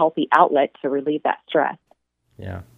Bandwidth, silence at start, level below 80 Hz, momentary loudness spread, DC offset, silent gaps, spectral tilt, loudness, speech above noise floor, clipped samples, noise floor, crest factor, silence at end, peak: 7.6 kHz; 0 s; -60 dBFS; 19 LU; under 0.1%; none; -7 dB/octave; -20 LUFS; 42 dB; under 0.1%; -63 dBFS; 22 dB; 0.15 s; 0 dBFS